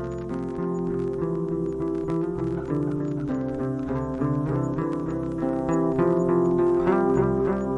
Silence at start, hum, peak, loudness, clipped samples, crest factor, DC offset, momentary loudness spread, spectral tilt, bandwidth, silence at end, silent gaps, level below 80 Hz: 0 s; none; -10 dBFS; -25 LUFS; under 0.1%; 16 dB; under 0.1%; 7 LU; -9.5 dB/octave; 7.8 kHz; 0 s; none; -46 dBFS